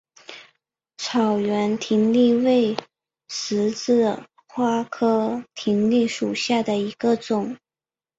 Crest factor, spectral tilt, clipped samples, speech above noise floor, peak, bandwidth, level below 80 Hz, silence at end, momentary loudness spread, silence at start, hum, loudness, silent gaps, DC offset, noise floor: 18 dB; -5 dB/octave; under 0.1%; over 69 dB; -4 dBFS; 8 kHz; -66 dBFS; 0.65 s; 14 LU; 0.3 s; none; -22 LUFS; none; under 0.1%; under -90 dBFS